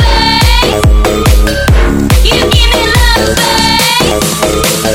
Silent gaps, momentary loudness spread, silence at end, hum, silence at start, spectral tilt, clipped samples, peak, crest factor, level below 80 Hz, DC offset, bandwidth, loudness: none; 3 LU; 0 s; none; 0 s; -4 dB/octave; 0.1%; 0 dBFS; 8 dB; -12 dBFS; under 0.1%; 17 kHz; -8 LUFS